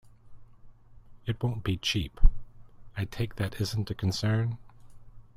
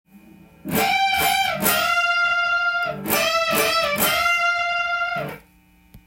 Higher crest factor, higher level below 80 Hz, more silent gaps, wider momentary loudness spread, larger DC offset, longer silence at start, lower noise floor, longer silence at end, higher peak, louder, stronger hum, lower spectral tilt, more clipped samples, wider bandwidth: about the same, 22 dB vs 20 dB; first, -32 dBFS vs -52 dBFS; neither; first, 11 LU vs 7 LU; neither; about the same, 0.25 s vs 0.15 s; second, -50 dBFS vs -54 dBFS; about the same, 0.15 s vs 0.1 s; second, -6 dBFS vs -2 dBFS; second, -31 LUFS vs -19 LUFS; neither; first, -5.5 dB/octave vs -2 dB/octave; neither; second, 14.5 kHz vs 17 kHz